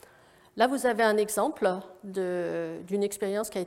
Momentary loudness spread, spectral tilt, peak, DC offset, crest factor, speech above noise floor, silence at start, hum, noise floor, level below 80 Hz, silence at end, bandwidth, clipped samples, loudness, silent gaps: 10 LU; -4 dB/octave; -8 dBFS; under 0.1%; 20 dB; 30 dB; 0.55 s; none; -58 dBFS; -68 dBFS; 0 s; 16.5 kHz; under 0.1%; -28 LUFS; none